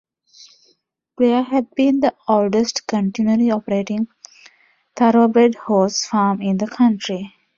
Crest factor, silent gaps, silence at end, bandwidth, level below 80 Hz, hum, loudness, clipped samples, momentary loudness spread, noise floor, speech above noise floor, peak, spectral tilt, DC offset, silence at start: 16 dB; none; 0.3 s; 7.6 kHz; -62 dBFS; none; -18 LUFS; under 0.1%; 8 LU; -63 dBFS; 46 dB; -2 dBFS; -5.5 dB/octave; under 0.1%; 1.2 s